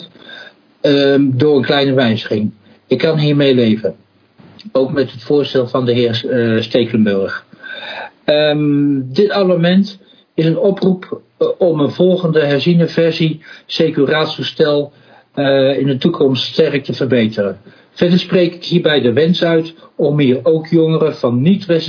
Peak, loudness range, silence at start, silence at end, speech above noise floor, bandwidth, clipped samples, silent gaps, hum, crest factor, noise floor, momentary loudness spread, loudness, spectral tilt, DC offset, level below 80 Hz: 0 dBFS; 2 LU; 0 s; 0 s; 32 dB; 5.4 kHz; under 0.1%; none; none; 14 dB; -45 dBFS; 10 LU; -14 LUFS; -8 dB/octave; under 0.1%; -60 dBFS